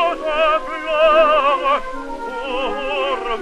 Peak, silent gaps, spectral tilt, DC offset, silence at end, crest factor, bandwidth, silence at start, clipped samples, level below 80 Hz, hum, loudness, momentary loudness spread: -4 dBFS; none; -3 dB/octave; under 0.1%; 0 s; 14 dB; 10.5 kHz; 0 s; under 0.1%; -38 dBFS; none; -17 LUFS; 13 LU